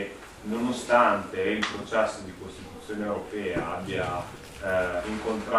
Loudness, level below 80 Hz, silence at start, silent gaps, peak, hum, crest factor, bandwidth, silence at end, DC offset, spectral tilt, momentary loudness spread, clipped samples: -28 LUFS; -52 dBFS; 0 s; none; -8 dBFS; none; 22 dB; 15 kHz; 0 s; under 0.1%; -5 dB/octave; 18 LU; under 0.1%